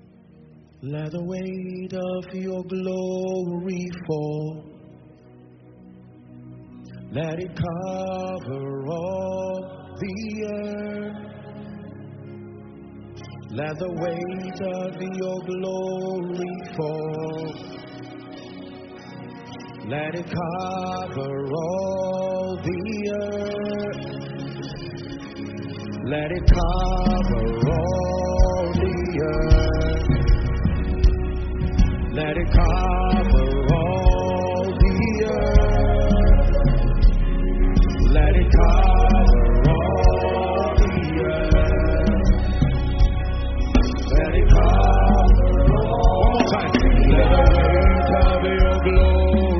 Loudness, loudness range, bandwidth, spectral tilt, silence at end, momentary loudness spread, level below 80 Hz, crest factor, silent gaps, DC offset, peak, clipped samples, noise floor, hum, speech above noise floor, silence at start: -22 LUFS; 15 LU; 6.4 kHz; -6.5 dB/octave; 0 s; 19 LU; -22 dBFS; 18 dB; none; under 0.1%; -2 dBFS; under 0.1%; -49 dBFS; none; 24 dB; 0.8 s